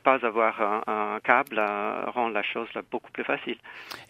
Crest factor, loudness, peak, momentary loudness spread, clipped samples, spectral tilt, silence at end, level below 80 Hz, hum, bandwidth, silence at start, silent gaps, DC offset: 24 dB; -27 LUFS; -4 dBFS; 12 LU; under 0.1%; -5 dB/octave; 0.05 s; -74 dBFS; none; 15 kHz; 0.05 s; none; under 0.1%